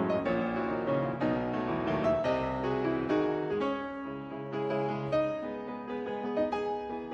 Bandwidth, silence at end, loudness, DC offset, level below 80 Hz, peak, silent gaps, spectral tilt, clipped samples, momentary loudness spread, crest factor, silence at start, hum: 8 kHz; 0 s; -32 LUFS; under 0.1%; -56 dBFS; -16 dBFS; none; -8 dB/octave; under 0.1%; 8 LU; 14 dB; 0 s; none